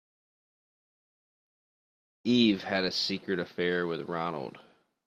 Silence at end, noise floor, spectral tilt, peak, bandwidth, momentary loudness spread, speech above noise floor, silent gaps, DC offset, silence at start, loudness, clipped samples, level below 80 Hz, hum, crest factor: 0.45 s; under -90 dBFS; -5 dB/octave; -12 dBFS; 9.4 kHz; 12 LU; over 61 dB; none; under 0.1%; 2.25 s; -29 LUFS; under 0.1%; -72 dBFS; none; 20 dB